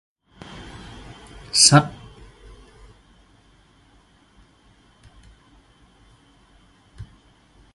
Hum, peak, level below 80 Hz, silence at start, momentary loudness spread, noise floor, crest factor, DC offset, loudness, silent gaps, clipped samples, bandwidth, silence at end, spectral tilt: none; 0 dBFS; -50 dBFS; 1.55 s; 32 LU; -56 dBFS; 28 dB; under 0.1%; -15 LUFS; none; under 0.1%; 11.5 kHz; 0.7 s; -3 dB/octave